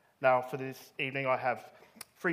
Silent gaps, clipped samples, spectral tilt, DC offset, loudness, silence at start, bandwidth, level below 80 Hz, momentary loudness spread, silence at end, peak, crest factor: none; under 0.1%; -5.5 dB/octave; under 0.1%; -33 LUFS; 0.2 s; 15.5 kHz; -84 dBFS; 15 LU; 0 s; -12 dBFS; 20 dB